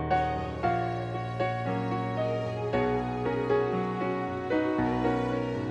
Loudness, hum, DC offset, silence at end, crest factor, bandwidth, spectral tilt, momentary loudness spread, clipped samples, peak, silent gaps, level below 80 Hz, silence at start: -29 LUFS; none; under 0.1%; 0 s; 14 dB; 8.8 kHz; -8 dB/octave; 4 LU; under 0.1%; -14 dBFS; none; -48 dBFS; 0 s